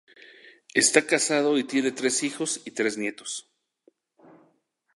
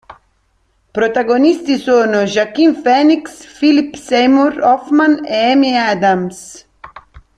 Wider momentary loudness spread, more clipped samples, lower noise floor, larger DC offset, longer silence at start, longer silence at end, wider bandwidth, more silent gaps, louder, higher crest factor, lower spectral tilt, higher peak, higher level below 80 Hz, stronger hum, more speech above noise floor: first, 12 LU vs 6 LU; neither; first, -69 dBFS vs -59 dBFS; neither; first, 0.75 s vs 0.1 s; first, 1.55 s vs 0.2 s; about the same, 11.5 kHz vs 10.5 kHz; neither; second, -24 LUFS vs -13 LUFS; first, 24 dB vs 12 dB; second, -2 dB/octave vs -5 dB/octave; about the same, -4 dBFS vs -2 dBFS; second, -80 dBFS vs -52 dBFS; neither; about the same, 44 dB vs 47 dB